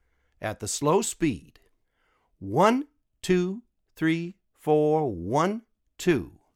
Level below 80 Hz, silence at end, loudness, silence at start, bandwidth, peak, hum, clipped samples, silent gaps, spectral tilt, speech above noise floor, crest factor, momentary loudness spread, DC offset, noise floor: -56 dBFS; 0.25 s; -26 LUFS; 0.4 s; 16.5 kHz; -8 dBFS; none; under 0.1%; none; -5.5 dB/octave; 45 dB; 20 dB; 15 LU; under 0.1%; -70 dBFS